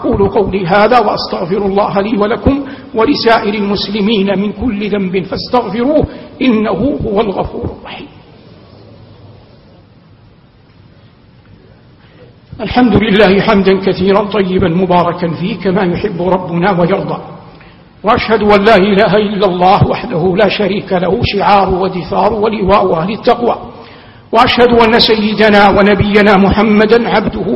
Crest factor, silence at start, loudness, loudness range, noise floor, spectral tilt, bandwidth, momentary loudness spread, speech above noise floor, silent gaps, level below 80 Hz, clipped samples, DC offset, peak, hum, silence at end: 12 dB; 0 s; -11 LUFS; 7 LU; -43 dBFS; -8 dB/octave; 7.4 kHz; 9 LU; 33 dB; none; -32 dBFS; 0.3%; under 0.1%; 0 dBFS; none; 0 s